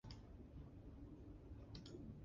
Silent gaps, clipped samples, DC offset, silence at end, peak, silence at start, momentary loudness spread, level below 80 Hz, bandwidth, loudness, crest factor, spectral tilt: none; under 0.1%; under 0.1%; 0 s; -42 dBFS; 0.05 s; 3 LU; -62 dBFS; 7.2 kHz; -59 LUFS; 14 dB; -7 dB/octave